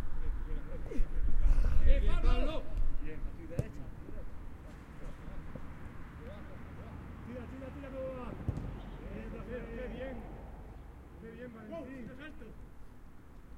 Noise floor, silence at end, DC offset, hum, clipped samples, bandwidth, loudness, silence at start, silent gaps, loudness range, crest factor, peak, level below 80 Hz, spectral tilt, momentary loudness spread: -50 dBFS; 0 s; under 0.1%; none; under 0.1%; 4.2 kHz; -41 LUFS; 0 s; none; 12 LU; 20 dB; -12 dBFS; -34 dBFS; -7.5 dB/octave; 17 LU